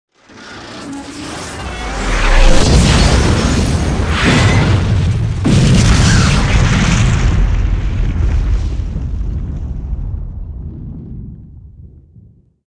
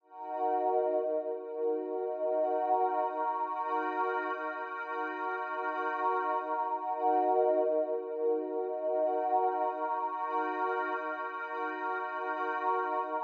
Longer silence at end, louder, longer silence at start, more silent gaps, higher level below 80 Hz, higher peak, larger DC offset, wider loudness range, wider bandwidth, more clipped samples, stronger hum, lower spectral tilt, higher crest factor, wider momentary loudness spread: first, 0.5 s vs 0 s; first, -14 LUFS vs -32 LUFS; first, 0.35 s vs 0.1 s; neither; first, -16 dBFS vs under -90 dBFS; first, 0 dBFS vs -16 dBFS; neither; first, 13 LU vs 3 LU; first, 10.5 kHz vs 6.4 kHz; neither; neither; about the same, -5 dB/octave vs -4 dB/octave; about the same, 12 dB vs 16 dB; first, 18 LU vs 6 LU